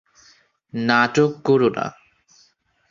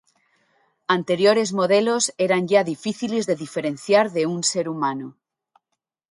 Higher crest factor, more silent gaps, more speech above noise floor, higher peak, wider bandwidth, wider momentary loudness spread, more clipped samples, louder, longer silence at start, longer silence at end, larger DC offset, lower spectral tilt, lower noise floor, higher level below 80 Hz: about the same, 20 dB vs 18 dB; neither; second, 42 dB vs 59 dB; about the same, -2 dBFS vs -4 dBFS; second, 7.4 kHz vs 11.5 kHz; first, 13 LU vs 9 LU; neither; about the same, -19 LUFS vs -21 LUFS; second, 0.75 s vs 0.9 s; about the same, 1 s vs 1 s; neither; first, -6 dB/octave vs -4 dB/octave; second, -61 dBFS vs -80 dBFS; first, -62 dBFS vs -70 dBFS